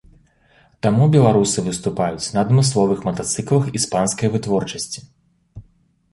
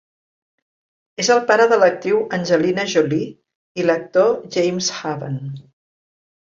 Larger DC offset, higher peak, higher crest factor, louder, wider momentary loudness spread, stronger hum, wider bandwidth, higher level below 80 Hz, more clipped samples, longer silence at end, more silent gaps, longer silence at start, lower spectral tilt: neither; about the same, -2 dBFS vs -2 dBFS; about the same, 18 dB vs 18 dB; about the same, -18 LUFS vs -18 LUFS; second, 9 LU vs 16 LU; neither; first, 11.5 kHz vs 7.6 kHz; first, -50 dBFS vs -64 dBFS; neither; second, 0.5 s vs 0.85 s; second, none vs 3.55-3.75 s; second, 0.85 s vs 1.2 s; about the same, -5.5 dB/octave vs -4.5 dB/octave